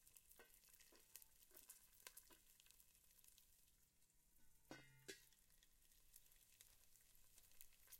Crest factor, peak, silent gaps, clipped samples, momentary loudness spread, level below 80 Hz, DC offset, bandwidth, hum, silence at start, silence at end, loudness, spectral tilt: 36 dB; -32 dBFS; none; under 0.1%; 8 LU; -82 dBFS; under 0.1%; 16.5 kHz; none; 0 s; 0 s; -66 LUFS; -1.5 dB/octave